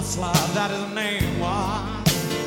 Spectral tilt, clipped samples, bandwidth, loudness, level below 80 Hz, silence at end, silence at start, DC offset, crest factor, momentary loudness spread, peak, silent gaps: -4 dB/octave; under 0.1%; 17.5 kHz; -23 LUFS; -38 dBFS; 0 s; 0 s; under 0.1%; 18 dB; 4 LU; -6 dBFS; none